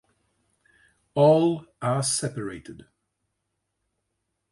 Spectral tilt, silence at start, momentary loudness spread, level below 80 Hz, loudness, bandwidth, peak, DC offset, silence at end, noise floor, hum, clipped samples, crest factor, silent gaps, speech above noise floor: -5 dB/octave; 1.15 s; 17 LU; -64 dBFS; -23 LUFS; 11.5 kHz; -6 dBFS; under 0.1%; 1.75 s; -79 dBFS; none; under 0.1%; 20 dB; none; 56 dB